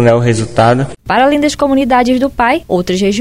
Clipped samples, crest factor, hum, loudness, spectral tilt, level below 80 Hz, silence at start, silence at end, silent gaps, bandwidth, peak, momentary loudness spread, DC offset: under 0.1%; 10 dB; none; -12 LUFS; -6 dB/octave; -36 dBFS; 0 s; 0 s; none; 15.5 kHz; 0 dBFS; 4 LU; under 0.1%